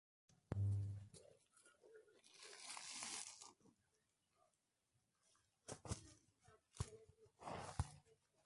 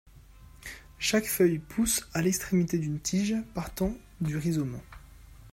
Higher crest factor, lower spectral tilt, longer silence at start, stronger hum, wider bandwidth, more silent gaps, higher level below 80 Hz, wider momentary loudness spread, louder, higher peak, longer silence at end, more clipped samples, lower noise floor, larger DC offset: first, 26 dB vs 18 dB; about the same, -4 dB/octave vs -4.5 dB/octave; about the same, 0.3 s vs 0.3 s; neither; second, 11.5 kHz vs 16 kHz; neither; second, -64 dBFS vs -50 dBFS; first, 22 LU vs 15 LU; second, -51 LUFS vs -29 LUFS; second, -28 dBFS vs -12 dBFS; first, 0.3 s vs 0 s; neither; first, -87 dBFS vs -52 dBFS; neither